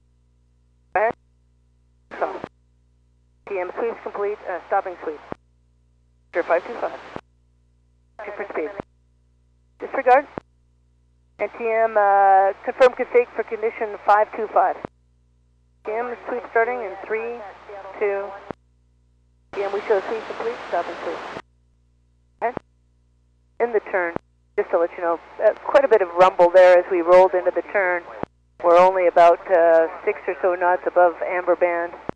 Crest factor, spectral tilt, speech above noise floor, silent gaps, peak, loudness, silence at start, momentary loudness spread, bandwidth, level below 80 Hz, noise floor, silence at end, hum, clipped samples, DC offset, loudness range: 16 dB; -5.5 dB/octave; 41 dB; none; -6 dBFS; -20 LUFS; 0.95 s; 21 LU; 8.2 kHz; -60 dBFS; -60 dBFS; 0.15 s; 60 Hz at -65 dBFS; under 0.1%; under 0.1%; 13 LU